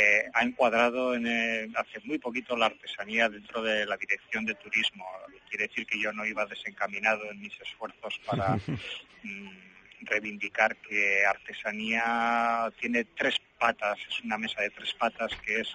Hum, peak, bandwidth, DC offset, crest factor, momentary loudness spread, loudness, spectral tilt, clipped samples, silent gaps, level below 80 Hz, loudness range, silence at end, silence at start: none; -10 dBFS; 9.4 kHz; under 0.1%; 22 dB; 14 LU; -29 LUFS; -4 dB/octave; under 0.1%; none; -64 dBFS; 5 LU; 0 s; 0 s